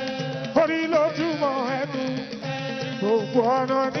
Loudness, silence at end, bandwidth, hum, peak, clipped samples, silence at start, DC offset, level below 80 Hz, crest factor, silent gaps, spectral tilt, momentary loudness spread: -24 LUFS; 0 s; 6.6 kHz; none; -6 dBFS; under 0.1%; 0 s; under 0.1%; -66 dBFS; 18 dB; none; -6 dB/octave; 8 LU